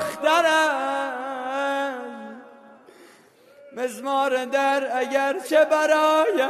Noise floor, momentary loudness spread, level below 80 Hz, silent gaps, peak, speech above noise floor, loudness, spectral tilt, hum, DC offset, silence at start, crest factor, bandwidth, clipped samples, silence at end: -53 dBFS; 13 LU; -76 dBFS; none; -6 dBFS; 32 dB; -22 LUFS; -2 dB/octave; none; under 0.1%; 0 s; 16 dB; 13.5 kHz; under 0.1%; 0 s